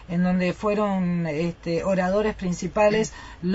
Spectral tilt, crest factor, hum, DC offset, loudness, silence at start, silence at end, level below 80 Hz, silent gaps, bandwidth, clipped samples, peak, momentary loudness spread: -6.5 dB/octave; 14 dB; none; under 0.1%; -24 LUFS; 0 s; 0 s; -46 dBFS; none; 8 kHz; under 0.1%; -10 dBFS; 7 LU